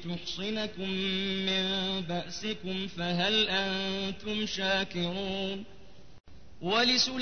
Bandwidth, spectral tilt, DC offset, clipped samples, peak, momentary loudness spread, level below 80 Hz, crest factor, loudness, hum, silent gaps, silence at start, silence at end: 6.6 kHz; -4 dB/octave; 0.5%; under 0.1%; -14 dBFS; 10 LU; -58 dBFS; 18 dB; -30 LUFS; none; 6.20-6.24 s; 0 s; 0 s